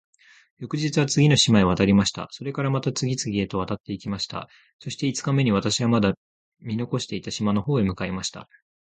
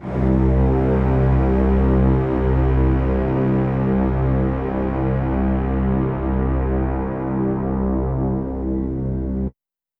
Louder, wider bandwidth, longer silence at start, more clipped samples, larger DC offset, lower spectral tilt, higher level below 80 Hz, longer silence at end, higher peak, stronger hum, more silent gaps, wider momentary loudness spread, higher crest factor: second, -23 LUFS vs -20 LUFS; first, 9.4 kHz vs 3.7 kHz; first, 0.6 s vs 0 s; neither; neither; second, -5 dB/octave vs -11.5 dB/octave; second, -48 dBFS vs -24 dBFS; about the same, 0.4 s vs 0.5 s; first, -2 dBFS vs -6 dBFS; neither; first, 3.80-3.84 s, 4.73-4.79 s, 6.17-6.52 s vs none; first, 14 LU vs 7 LU; first, 22 dB vs 12 dB